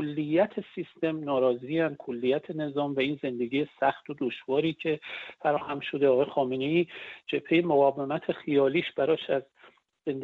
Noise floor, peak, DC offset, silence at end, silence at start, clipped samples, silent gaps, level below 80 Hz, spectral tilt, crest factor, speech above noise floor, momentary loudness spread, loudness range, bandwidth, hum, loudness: -59 dBFS; -12 dBFS; under 0.1%; 0 s; 0 s; under 0.1%; none; -72 dBFS; -8.5 dB/octave; 16 dB; 31 dB; 9 LU; 3 LU; 4.8 kHz; none; -28 LUFS